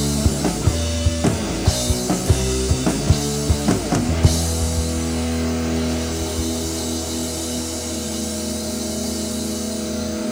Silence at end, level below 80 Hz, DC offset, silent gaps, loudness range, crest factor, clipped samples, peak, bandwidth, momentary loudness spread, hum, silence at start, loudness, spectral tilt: 0 s; -28 dBFS; under 0.1%; none; 4 LU; 20 dB; under 0.1%; 0 dBFS; 16.5 kHz; 5 LU; none; 0 s; -21 LUFS; -4.5 dB/octave